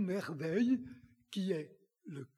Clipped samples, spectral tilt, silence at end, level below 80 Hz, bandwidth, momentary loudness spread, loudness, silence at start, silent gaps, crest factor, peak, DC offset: under 0.1%; -7 dB/octave; 0.1 s; -76 dBFS; 13 kHz; 20 LU; -37 LUFS; 0 s; none; 16 dB; -22 dBFS; under 0.1%